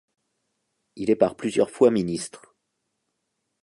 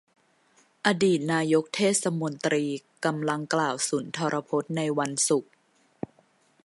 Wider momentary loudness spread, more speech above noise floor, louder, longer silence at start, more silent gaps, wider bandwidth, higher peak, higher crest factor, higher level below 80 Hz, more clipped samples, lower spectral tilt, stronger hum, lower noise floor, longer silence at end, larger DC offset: first, 12 LU vs 6 LU; first, 56 dB vs 38 dB; first, -23 LUFS vs -26 LUFS; about the same, 0.95 s vs 0.85 s; neither; about the same, 11.5 kHz vs 12 kHz; about the same, -4 dBFS vs -4 dBFS; about the same, 22 dB vs 24 dB; first, -62 dBFS vs -74 dBFS; neither; first, -6 dB/octave vs -4 dB/octave; neither; first, -78 dBFS vs -64 dBFS; about the same, 1.25 s vs 1.2 s; neither